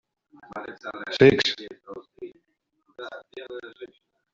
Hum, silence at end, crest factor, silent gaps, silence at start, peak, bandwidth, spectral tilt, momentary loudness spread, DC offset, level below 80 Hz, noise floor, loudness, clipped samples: none; 0.5 s; 24 dB; none; 0.5 s; -2 dBFS; 7.6 kHz; -3.5 dB/octave; 26 LU; under 0.1%; -58 dBFS; -73 dBFS; -21 LUFS; under 0.1%